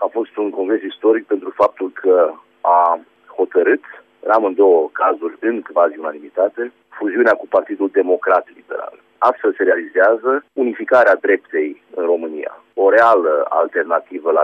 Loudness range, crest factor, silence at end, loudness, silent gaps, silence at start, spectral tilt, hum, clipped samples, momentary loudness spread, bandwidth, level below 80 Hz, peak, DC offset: 2 LU; 14 dB; 0 s; -16 LUFS; none; 0 s; -6 dB/octave; none; under 0.1%; 12 LU; 6.2 kHz; -68 dBFS; -2 dBFS; under 0.1%